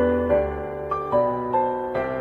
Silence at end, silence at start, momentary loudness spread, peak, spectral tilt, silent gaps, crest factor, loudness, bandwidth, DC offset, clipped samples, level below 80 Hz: 0 s; 0 s; 7 LU; -6 dBFS; -9 dB/octave; none; 16 dB; -24 LUFS; 4.9 kHz; under 0.1%; under 0.1%; -44 dBFS